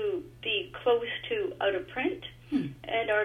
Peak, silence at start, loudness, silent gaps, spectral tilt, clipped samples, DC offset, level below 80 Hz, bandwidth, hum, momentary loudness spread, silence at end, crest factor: -14 dBFS; 0 s; -31 LUFS; none; -6 dB/octave; under 0.1%; under 0.1%; -60 dBFS; 14.5 kHz; none; 6 LU; 0 s; 16 dB